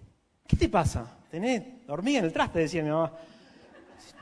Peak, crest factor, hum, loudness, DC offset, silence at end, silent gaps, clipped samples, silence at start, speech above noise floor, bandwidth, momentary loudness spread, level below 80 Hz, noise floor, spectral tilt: -8 dBFS; 22 dB; none; -28 LUFS; under 0.1%; 0 s; none; under 0.1%; 0 s; 26 dB; 11 kHz; 12 LU; -42 dBFS; -55 dBFS; -6 dB/octave